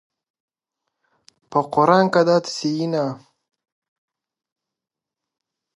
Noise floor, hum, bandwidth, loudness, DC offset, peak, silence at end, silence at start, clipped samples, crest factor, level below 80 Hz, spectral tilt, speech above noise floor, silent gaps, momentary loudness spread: -87 dBFS; none; 11.5 kHz; -19 LUFS; under 0.1%; -2 dBFS; 2.6 s; 1.5 s; under 0.1%; 22 dB; -70 dBFS; -5.5 dB/octave; 69 dB; none; 9 LU